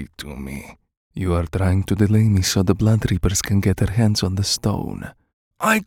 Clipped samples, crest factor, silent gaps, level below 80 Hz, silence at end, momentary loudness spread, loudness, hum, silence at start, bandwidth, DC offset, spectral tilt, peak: under 0.1%; 18 dB; 0.97-1.11 s, 5.33-5.51 s; -36 dBFS; 0.05 s; 16 LU; -19 LUFS; none; 0 s; 17 kHz; under 0.1%; -5 dB/octave; 0 dBFS